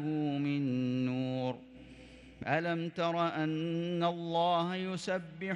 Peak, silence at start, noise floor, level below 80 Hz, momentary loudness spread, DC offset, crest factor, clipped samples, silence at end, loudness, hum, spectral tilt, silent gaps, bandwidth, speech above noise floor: -16 dBFS; 0 s; -53 dBFS; -68 dBFS; 15 LU; under 0.1%; 18 dB; under 0.1%; 0 s; -34 LUFS; none; -6.5 dB/octave; none; 11 kHz; 20 dB